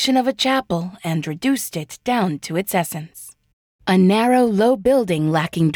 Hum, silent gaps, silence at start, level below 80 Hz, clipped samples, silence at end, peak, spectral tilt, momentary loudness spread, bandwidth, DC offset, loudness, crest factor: none; 3.53-3.79 s; 0 s; -54 dBFS; under 0.1%; 0 s; -6 dBFS; -5.5 dB/octave; 12 LU; over 20 kHz; under 0.1%; -19 LUFS; 12 dB